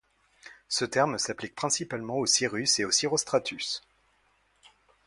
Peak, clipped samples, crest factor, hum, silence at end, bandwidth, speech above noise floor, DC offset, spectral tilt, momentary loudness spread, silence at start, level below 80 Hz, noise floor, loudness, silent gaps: -10 dBFS; under 0.1%; 20 dB; none; 1.25 s; 11.5 kHz; 40 dB; under 0.1%; -2 dB/octave; 9 LU; 0.45 s; -68 dBFS; -68 dBFS; -27 LUFS; none